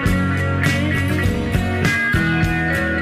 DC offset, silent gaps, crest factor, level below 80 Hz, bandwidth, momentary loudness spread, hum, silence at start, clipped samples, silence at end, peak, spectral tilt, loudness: under 0.1%; none; 14 dB; -30 dBFS; 15.5 kHz; 3 LU; none; 0 s; under 0.1%; 0 s; -4 dBFS; -6 dB/octave; -18 LUFS